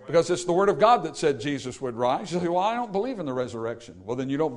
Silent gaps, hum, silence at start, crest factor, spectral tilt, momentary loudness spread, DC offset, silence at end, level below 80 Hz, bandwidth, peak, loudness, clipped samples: none; none; 0 s; 18 dB; -5.5 dB/octave; 12 LU; under 0.1%; 0 s; -58 dBFS; 11 kHz; -6 dBFS; -25 LUFS; under 0.1%